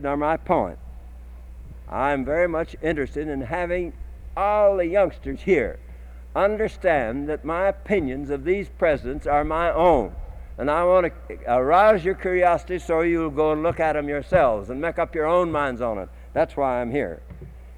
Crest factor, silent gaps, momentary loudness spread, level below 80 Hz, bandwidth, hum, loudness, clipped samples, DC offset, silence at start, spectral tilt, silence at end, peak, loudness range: 16 dB; none; 16 LU; -38 dBFS; 12 kHz; none; -23 LUFS; under 0.1%; under 0.1%; 0 s; -7.5 dB/octave; 0 s; -6 dBFS; 5 LU